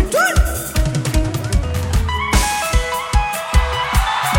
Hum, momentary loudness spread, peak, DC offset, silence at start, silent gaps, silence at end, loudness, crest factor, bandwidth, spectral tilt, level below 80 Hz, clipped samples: none; 4 LU; -2 dBFS; under 0.1%; 0 s; none; 0 s; -18 LUFS; 14 dB; 17 kHz; -4 dB/octave; -20 dBFS; under 0.1%